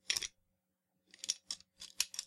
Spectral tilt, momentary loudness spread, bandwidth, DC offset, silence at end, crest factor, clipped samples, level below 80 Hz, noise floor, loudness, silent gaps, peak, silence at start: 2.5 dB/octave; 10 LU; 16 kHz; under 0.1%; 0 s; 30 dB; under 0.1%; -76 dBFS; -84 dBFS; -40 LUFS; none; -14 dBFS; 0.1 s